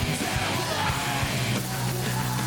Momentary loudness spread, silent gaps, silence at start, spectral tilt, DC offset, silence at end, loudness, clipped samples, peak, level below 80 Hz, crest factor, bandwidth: 2 LU; none; 0 s; -4 dB/octave; under 0.1%; 0 s; -26 LUFS; under 0.1%; -14 dBFS; -42 dBFS; 14 dB; 19 kHz